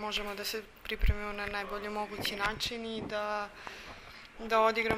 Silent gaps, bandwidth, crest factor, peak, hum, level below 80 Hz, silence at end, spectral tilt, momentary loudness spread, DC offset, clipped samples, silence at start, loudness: none; 16 kHz; 20 dB; -14 dBFS; none; -42 dBFS; 0 s; -4 dB/octave; 16 LU; under 0.1%; under 0.1%; 0 s; -34 LUFS